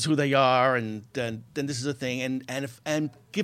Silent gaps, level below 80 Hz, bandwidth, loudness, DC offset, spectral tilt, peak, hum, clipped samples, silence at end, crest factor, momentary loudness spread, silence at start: none; -70 dBFS; 15 kHz; -27 LUFS; under 0.1%; -5 dB/octave; -8 dBFS; none; under 0.1%; 0 s; 18 dB; 12 LU; 0 s